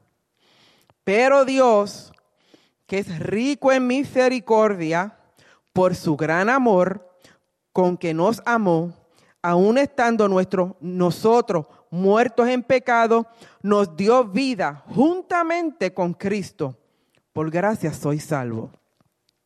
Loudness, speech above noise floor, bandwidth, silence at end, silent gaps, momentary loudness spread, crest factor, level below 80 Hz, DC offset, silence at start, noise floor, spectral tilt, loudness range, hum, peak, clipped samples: -20 LUFS; 47 dB; 13.5 kHz; 0.75 s; none; 11 LU; 16 dB; -64 dBFS; under 0.1%; 1.05 s; -67 dBFS; -6.5 dB/octave; 4 LU; none; -6 dBFS; under 0.1%